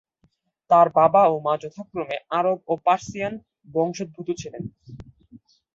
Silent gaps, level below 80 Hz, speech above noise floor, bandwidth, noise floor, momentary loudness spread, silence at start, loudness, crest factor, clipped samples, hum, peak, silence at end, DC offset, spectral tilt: none; -60 dBFS; 45 dB; 7.8 kHz; -66 dBFS; 17 LU; 0.7 s; -22 LUFS; 20 dB; under 0.1%; none; -4 dBFS; 0.4 s; under 0.1%; -6 dB/octave